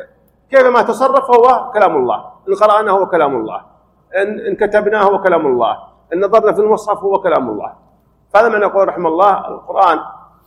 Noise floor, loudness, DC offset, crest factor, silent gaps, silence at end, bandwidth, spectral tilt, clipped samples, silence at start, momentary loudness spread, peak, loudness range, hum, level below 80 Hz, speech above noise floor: -52 dBFS; -13 LUFS; under 0.1%; 14 dB; none; 0.3 s; 12.5 kHz; -5.5 dB/octave; 0.3%; 0 s; 11 LU; 0 dBFS; 3 LU; none; -52 dBFS; 40 dB